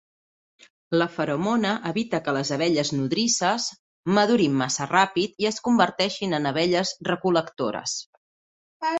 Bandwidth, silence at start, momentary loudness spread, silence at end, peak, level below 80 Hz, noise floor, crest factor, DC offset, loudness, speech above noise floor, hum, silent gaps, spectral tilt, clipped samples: 8.4 kHz; 0.9 s; 7 LU; 0 s; -4 dBFS; -64 dBFS; under -90 dBFS; 20 dB; under 0.1%; -24 LUFS; over 67 dB; none; 3.79-4.03 s, 8.06-8.80 s; -4 dB/octave; under 0.1%